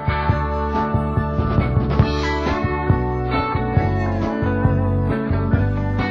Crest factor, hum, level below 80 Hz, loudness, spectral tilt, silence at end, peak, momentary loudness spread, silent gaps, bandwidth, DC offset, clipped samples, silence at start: 16 dB; none; -26 dBFS; -20 LUFS; -8.5 dB/octave; 0 s; -2 dBFS; 3 LU; none; 7 kHz; under 0.1%; under 0.1%; 0 s